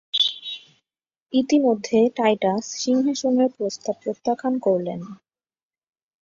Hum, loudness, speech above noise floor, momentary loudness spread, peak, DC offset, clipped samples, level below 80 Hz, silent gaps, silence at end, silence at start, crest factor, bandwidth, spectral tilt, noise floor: none; -22 LUFS; over 69 dB; 12 LU; -6 dBFS; under 0.1%; under 0.1%; -68 dBFS; 1.22-1.26 s; 1.05 s; 0.15 s; 16 dB; 7.6 kHz; -4 dB/octave; under -90 dBFS